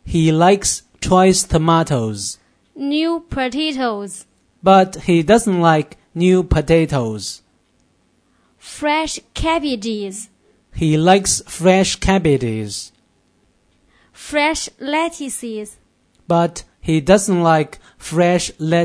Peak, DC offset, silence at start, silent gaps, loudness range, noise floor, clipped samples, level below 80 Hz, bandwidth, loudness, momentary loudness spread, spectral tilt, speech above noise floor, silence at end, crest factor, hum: 0 dBFS; under 0.1%; 0.05 s; none; 8 LU; -60 dBFS; under 0.1%; -36 dBFS; 11 kHz; -17 LUFS; 15 LU; -5 dB/octave; 44 dB; 0 s; 18 dB; none